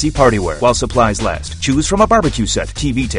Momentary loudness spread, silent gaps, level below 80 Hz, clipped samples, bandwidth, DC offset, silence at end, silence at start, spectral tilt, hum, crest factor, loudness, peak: 7 LU; none; -26 dBFS; under 0.1%; 11 kHz; under 0.1%; 0 s; 0 s; -4.5 dB/octave; none; 14 dB; -15 LUFS; 0 dBFS